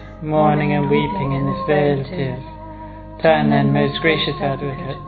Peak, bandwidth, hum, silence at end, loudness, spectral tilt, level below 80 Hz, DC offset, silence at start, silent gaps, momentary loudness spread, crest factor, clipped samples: -2 dBFS; 4.8 kHz; none; 0 s; -18 LUFS; -10.5 dB/octave; -40 dBFS; under 0.1%; 0 s; none; 17 LU; 18 dB; under 0.1%